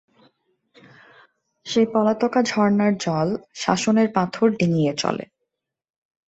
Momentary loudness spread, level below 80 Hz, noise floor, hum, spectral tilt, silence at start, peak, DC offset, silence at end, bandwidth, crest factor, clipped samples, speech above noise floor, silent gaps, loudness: 7 LU; -62 dBFS; -80 dBFS; none; -5.5 dB/octave; 1.65 s; -4 dBFS; under 0.1%; 1.05 s; 8.2 kHz; 20 dB; under 0.1%; 60 dB; none; -21 LUFS